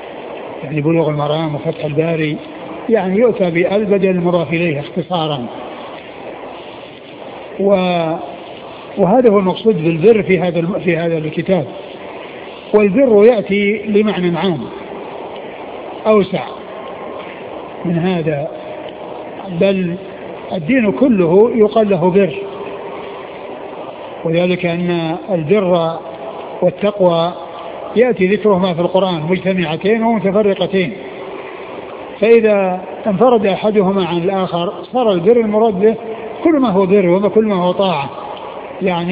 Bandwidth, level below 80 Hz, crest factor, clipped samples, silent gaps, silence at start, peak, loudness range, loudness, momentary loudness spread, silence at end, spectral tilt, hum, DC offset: 5 kHz; -52 dBFS; 14 dB; under 0.1%; none; 0 s; 0 dBFS; 6 LU; -14 LUFS; 17 LU; 0 s; -10.5 dB/octave; none; under 0.1%